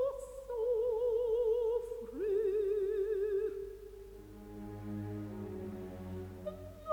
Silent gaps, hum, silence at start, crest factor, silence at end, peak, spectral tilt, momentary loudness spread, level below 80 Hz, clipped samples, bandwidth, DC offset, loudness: none; none; 0 s; 14 dB; 0 s; -22 dBFS; -8 dB/octave; 16 LU; -58 dBFS; under 0.1%; 20 kHz; under 0.1%; -36 LUFS